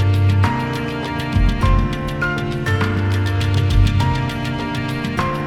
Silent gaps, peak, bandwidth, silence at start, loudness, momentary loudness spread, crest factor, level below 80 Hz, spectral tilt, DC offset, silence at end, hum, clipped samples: none; -2 dBFS; 12 kHz; 0 s; -19 LUFS; 6 LU; 14 dB; -24 dBFS; -6.5 dB/octave; under 0.1%; 0 s; none; under 0.1%